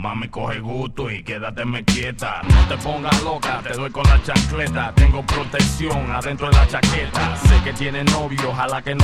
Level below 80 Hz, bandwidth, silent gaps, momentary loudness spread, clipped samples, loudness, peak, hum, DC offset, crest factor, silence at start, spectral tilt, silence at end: -22 dBFS; 13.5 kHz; none; 10 LU; under 0.1%; -19 LUFS; 0 dBFS; none; under 0.1%; 18 dB; 0 s; -5 dB/octave; 0 s